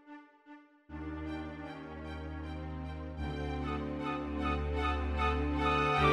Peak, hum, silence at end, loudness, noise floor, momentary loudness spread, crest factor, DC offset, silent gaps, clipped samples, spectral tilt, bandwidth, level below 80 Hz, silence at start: -16 dBFS; none; 0 s; -36 LUFS; -57 dBFS; 14 LU; 20 dB; under 0.1%; none; under 0.1%; -7 dB/octave; 10 kHz; -42 dBFS; 0.05 s